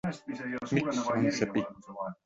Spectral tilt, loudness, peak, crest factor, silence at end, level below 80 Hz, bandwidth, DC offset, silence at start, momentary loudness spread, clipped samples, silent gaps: -5.5 dB/octave; -32 LUFS; -12 dBFS; 20 dB; 0.1 s; -64 dBFS; 8 kHz; under 0.1%; 0.05 s; 11 LU; under 0.1%; none